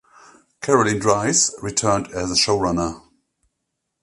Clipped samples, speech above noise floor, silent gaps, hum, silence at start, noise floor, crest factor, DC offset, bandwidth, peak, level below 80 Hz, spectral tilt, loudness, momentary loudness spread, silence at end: under 0.1%; 58 dB; none; none; 0.6 s; -77 dBFS; 20 dB; under 0.1%; 11.5 kHz; 0 dBFS; -46 dBFS; -3 dB/octave; -19 LUFS; 7 LU; 1.05 s